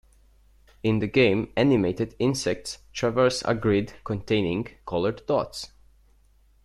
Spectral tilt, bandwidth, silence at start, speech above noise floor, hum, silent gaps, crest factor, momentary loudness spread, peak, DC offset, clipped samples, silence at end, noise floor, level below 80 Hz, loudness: -5.5 dB/octave; 13 kHz; 0.85 s; 35 dB; none; none; 18 dB; 11 LU; -8 dBFS; under 0.1%; under 0.1%; 0.95 s; -59 dBFS; -52 dBFS; -25 LUFS